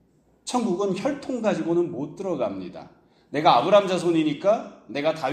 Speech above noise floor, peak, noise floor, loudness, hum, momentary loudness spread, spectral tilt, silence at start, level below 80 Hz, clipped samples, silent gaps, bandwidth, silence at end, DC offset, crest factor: 19 dB; -4 dBFS; -42 dBFS; -24 LUFS; none; 13 LU; -5.5 dB/octave; 0.45 s; -66 dBFS; under 0.1%; none; 9.8 kHz; 0 s; under 0.1%; 20 dB